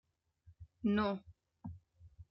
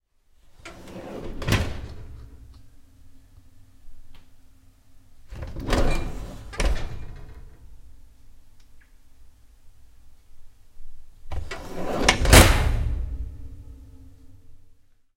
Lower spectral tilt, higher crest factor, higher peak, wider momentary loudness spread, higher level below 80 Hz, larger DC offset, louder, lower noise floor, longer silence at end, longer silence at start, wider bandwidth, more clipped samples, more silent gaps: first, -9 dB/octave vs -4 dB/octave; second, 18 dB vs 26 dB; second, -22 dBFS vs 0 dBFS; second, 19 LU vs 29 LU; second, -66 dBFS vs -30 dBFS; neither; second, -37 LUFS vs -23 LUFS; first, -67 dBFS vs -55 dBFS; second, 0.1 s vs 0.45 s; about the same, 0.5 s vs 0.5 s; second, 5.8 kHz vs 16 kHz; neither; neither